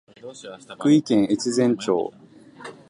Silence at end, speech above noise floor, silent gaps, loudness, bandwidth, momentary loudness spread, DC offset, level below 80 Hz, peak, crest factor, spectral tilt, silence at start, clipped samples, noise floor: 0.15 s; 21 dB; none; -21 LUFS; 11 kHz; 22 LU; under 0.1%; -66 dBFS; -6 dBFS; 16 dB; -5.5 dB/octave; 0.25 s; under 0.1%; -42 dBFS